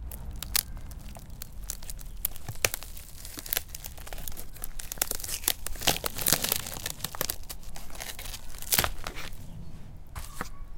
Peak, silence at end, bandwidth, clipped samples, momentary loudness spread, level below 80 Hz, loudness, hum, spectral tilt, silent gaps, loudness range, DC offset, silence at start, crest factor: -2 dBFS; 0 s; 17 kHz; under 0.1%; 19 LU; -42 dBFS; -31 LUFS; none; -1.5 dB/octave; none; 5 LU; under 0.1%; 0 s; 32 dB